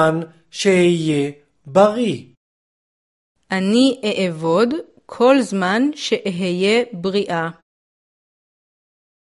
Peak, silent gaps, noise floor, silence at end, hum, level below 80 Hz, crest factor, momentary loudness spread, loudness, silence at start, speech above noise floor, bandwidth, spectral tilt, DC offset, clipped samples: 0 dBFS; 2.37-3.35 s; under -90 dBFS; 1.75 s; none; -62 dBFS; 18 dB; 11 LU; -18 LUFS; 0 s; over 73 dB; 11.5 kHz; -5.5 dB/octave; under 0.1%; under 0.1%